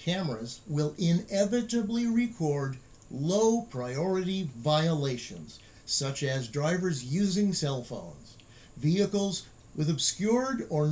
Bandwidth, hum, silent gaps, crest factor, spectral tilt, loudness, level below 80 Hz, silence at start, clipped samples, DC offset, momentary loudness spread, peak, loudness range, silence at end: 8 kHz; none; none; 16 dB; -5.5 dB/octave; -29 LUFS; -60 dBFS; 0 s; under 0.1%; under 0.1%; 12 LU; -14 dBFS; 2 LU; 0 s